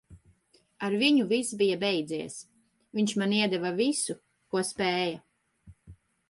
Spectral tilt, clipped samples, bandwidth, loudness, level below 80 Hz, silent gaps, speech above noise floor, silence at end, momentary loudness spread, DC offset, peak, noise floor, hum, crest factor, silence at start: -4 dB/octave; under 0.1%; 11.5 kHz; -28 LUFS; -66 dBFS; none; 38 dB; 0.35 s; 13 LU; under 0.1%; -12 dBFS; -66 dBFS; none; 18 dB; 0.1 s